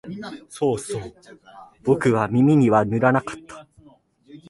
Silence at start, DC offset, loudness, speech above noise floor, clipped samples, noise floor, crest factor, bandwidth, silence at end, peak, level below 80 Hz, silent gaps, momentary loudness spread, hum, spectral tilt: 0.05 s; under 0.1%; -20 LUFS; 33 dB; under 0.1%; -54 dBFS; 20 dB; 11.5 kHz; 0.15 s; -2 dBFS; -56 dBFS; none; 19 LU; none; -7.5 dB/octave